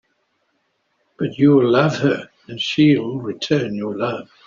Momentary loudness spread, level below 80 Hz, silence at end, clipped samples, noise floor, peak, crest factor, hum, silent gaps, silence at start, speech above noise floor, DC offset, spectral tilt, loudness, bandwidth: 12 LU; -60 dBFS; 0.25 s; under 0.1%; -68 dBFS; -2 dBFS; 16 dB; none; none; 1.2 s; 50 dB; under 0.1%; -6.5 dB/octave; -18 LUFS; 7.4 kHz